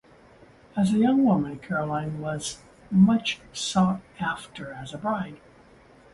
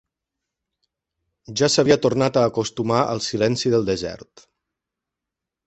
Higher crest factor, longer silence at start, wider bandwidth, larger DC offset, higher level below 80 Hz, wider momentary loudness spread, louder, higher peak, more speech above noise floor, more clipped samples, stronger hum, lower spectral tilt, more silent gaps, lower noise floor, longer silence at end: about the same, 18 dB vs 20 dB; second, 0.75 s vs 1.5 s; first, 11.5 kHz vs 8.4 kHz; neither; about the same, -56 dBFS vs -54 dBFS; first, 15 LU vs 10 LU; second, -25 LUFS vs -20 LUFS; second, -8 dBFS vs -4 dBFS; second, 29 dB vs 65 dB; neither; neither; about the same, -5.5 dB/octave vs -4.5 dB/octave; neither; second, -53 dBFS vs -85 dBFS; second, 0.75 s vs 1.5 s